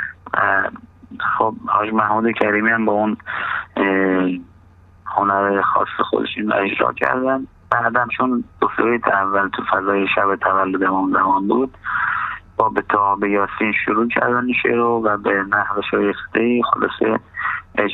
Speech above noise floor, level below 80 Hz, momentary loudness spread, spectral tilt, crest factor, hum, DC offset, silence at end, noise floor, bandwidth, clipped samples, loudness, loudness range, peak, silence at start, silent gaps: 29 dB; -52 dBFS; 6 LU; -8 dB/octave; 18 dB; none; under 0.1%; 0 s; -47 dBFS; 4.6 kHz; under 0.1%; -18 LUFS; 2 LU; 0 dBFS; 0 s; none